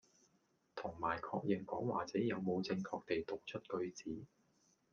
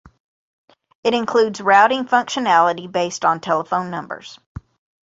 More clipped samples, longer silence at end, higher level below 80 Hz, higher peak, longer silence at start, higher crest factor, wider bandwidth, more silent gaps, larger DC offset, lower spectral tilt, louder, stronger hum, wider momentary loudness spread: neither; first, 0.65 s vs 0.45 s; second, -74 dBFS vs -54 dBFS; second, -22 dBFS vs -2 dBFS; second, 0.75 s vs 1.05 s; about the same, 20 dB vs 18 dB; second, 7.2 kHz vs 8 kHz; second, none vs 4.46-4.55 s; neither; first, -6.5 dB/octave vs -4 dB/octave; second, -42 LUFS vs -18 LUFS; neither; second, 10 LU vs 17 LU